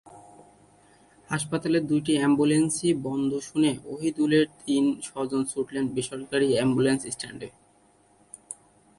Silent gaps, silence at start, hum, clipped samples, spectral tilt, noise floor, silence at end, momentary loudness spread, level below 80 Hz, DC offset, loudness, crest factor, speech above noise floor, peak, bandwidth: none; 0.05 s; none; under 0.1%; -5 dB/octave; -61 dBFS; 0.45 s; 12 LU; -62 dBFS; under 0.1%; -25 LUFS; 16 dB; 36 dB; -10 dBFS; 11.5 kHz